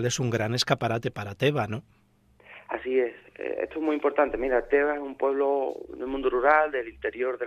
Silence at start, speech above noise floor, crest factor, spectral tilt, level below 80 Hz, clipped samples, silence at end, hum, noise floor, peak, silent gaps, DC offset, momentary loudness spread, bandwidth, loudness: 0 s; 33 dB; 22 dB; -5 dB/octave; -54 dBFS; under 0.1%; 0 s; none; -59 dBFS; -6 dBFS; none; under 0.1%; 11 LU; 14.5 kHz; -27 LUFS